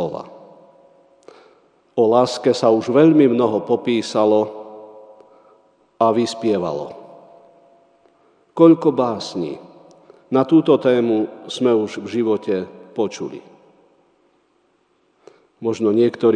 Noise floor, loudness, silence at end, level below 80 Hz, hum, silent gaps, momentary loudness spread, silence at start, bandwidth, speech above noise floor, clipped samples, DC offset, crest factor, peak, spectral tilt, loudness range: -62 dBFS; -18 LUFS; 0 s; -70 dBFS; none; none; 18 LU; 0 s; 10 kHz; 45 dB; under 0.1%; under 0.1%; 20 dB; 0 dBFS; -6.5 dB/octave; 8 LU